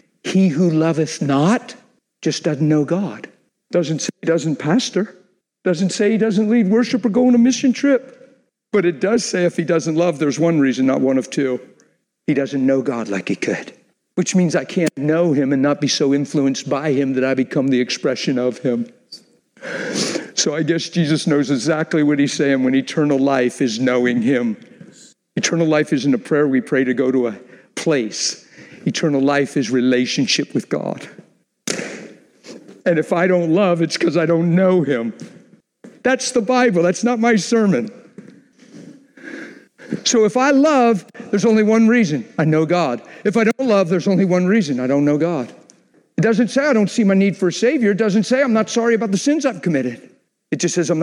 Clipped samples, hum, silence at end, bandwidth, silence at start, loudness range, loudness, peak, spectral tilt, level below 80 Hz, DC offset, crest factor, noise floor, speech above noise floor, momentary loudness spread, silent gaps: under 0.1%; none; 0 s; 11.5 kHz; 0.25 s; 4 LU; -17 LUFS; -2 dBFS; -5.5 dB/octave; -68 dBFS; under 0.1%; 16 dB; -58 dBFS; 42 dB; 10 LU; none